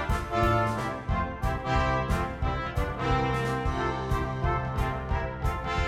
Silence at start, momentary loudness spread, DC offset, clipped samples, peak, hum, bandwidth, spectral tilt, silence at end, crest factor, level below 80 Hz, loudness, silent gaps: 0 s; 5 LU; under 0.1%; under 0.1%; -12 dBFS; none; 15.5 kHz; -6.5 dB/octave; 0 s; 16 dB; -34 dBFS; -29 LUFS; none